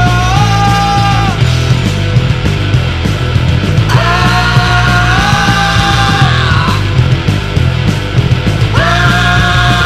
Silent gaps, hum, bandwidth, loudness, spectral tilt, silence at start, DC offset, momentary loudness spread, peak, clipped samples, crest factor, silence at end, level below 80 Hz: none; none; 14 kHz; -10 LUFS; -5.5 dB/octave; 0 s; under 0.1%; 4 LU; 0 dBFS; 0.4%; 8 dB; 0 s; -20 dBFS